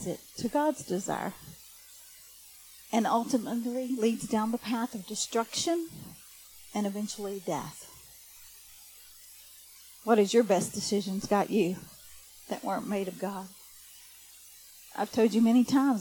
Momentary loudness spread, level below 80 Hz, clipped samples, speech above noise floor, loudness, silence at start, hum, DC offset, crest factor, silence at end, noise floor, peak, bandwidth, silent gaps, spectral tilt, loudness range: 24 LU; -68 dBFS; under 0.1%; 24 dB; -30 LUFS; 0 s; none; under 0.1%; 20 dB; 0 s; -53 dBFS; -10 dBFS; 19 kHz; none; -4.5 dB/octave; 9 LU